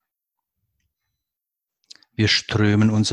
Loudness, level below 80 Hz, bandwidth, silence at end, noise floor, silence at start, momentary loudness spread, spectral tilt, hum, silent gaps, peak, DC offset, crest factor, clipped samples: -19 LUFS; -48 dBFS; 10.5 kHz; 0 s; -85 dBFS; 2.2 s; 7 LU; -5 dB/octave; none; none; -4 dBFS; under 0.1%; 18 dB; under 0.1%